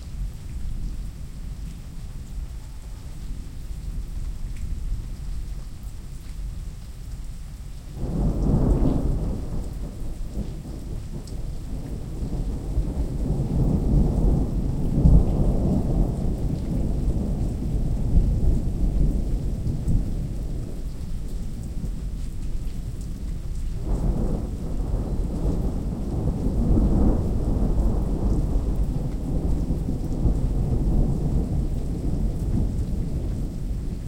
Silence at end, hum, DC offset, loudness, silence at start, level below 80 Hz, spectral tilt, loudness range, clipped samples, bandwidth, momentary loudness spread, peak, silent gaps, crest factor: 0 s; none; under 0.1%; -27 LUFS; 0 s; -26 dBFS; -8.5 dB/octave; 12 LU; under 0.1%; 11 kHz; 15 LU; -2 dBFS; none; 20 dB